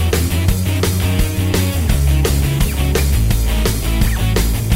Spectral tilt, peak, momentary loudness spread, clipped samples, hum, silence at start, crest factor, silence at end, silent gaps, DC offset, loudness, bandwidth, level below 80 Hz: -5 dB/octave; 0 dBFS; 2 LU; under 0.1%; none; 0 s; 14 dB; 0 s; none; under 0.1%; -16 LUFS; 16.5 kHz; -18 dBFS